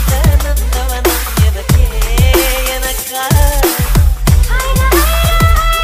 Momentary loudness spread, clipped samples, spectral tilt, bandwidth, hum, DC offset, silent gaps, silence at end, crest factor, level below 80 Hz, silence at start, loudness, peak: 5 LU; under 0.1%; -4.5 dB/octave; 16.5 kHz; none; under 0.1%; none; 0 s; 10 dB; -12 dBFS; 0 s; -12 LUFS; 0 dBFS